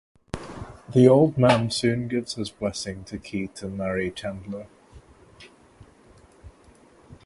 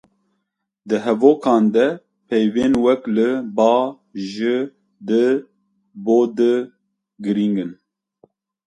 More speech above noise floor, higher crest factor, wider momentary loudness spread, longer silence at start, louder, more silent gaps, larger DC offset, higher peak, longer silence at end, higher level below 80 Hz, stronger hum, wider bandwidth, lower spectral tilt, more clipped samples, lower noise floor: second, 31 dB vs 58 dB; first, 24 dB vs 18 dB; first, 20 LU vs 14 LU; second, 0.35 s vs 0.85 s; second, -23 LUFS vs -18 LUFS; neither; neither; about the same, -2 dBFS vs 0 dBFS; second, 0.1 s vs 0.95 s; first, -52 dBFS vs -60 dBFS; neither; about the same, 11.5 kHz vs 10.5 kHz; about the same, -6 dB/octave vs -7 dB/octave; neither; second, -54 dBFS vs -75 dBFS